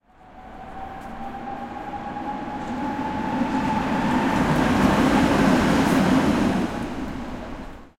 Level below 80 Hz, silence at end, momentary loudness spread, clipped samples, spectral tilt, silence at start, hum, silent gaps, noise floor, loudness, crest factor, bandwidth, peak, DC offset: -40 dBFS; 0.1 s; 17 LU; under 0.1%; -6 dB/octave; 0.25 s; none; none; -45 dBFS; -22 LUFS; 16 dB; 16.5 kHz; -6 dBFS; under 0.1%